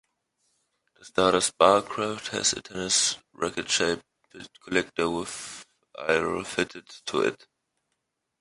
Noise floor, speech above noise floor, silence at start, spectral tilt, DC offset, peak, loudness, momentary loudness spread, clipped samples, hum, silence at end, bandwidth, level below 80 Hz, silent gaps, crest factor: -80 dBFS; 54 dB; 1.05 s; -2 dB/octave; under 0.1%; -4 dBFS; -26 LUFS; 17 LU; under 0.1%; none; 1.05 s; 11.5 kHz; -60 dBFS; none; 24 dB